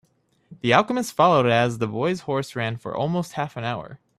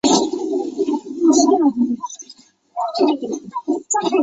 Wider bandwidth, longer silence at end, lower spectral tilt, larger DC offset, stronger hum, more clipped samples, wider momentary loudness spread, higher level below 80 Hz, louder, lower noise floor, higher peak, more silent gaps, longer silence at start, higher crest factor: first, 14.5 kHz vs 8.4 kHz; first, 0.25 s vs 0 s; first, -5.5 dB/octave vs -3.5 dB/octave; neither; neither; neither; second, 11 LU vs 14 LU; about the same, -60 dBFS vs -62 dBFS; second, -23 LUFS vs -19 LUFS; first, -57 dBFS vs -47 dBFS; about the same, -2 dBFS vs -2 dBFS; neither; first, 0.5 s vs 0.05 s; first, 22 dB vs 16 dB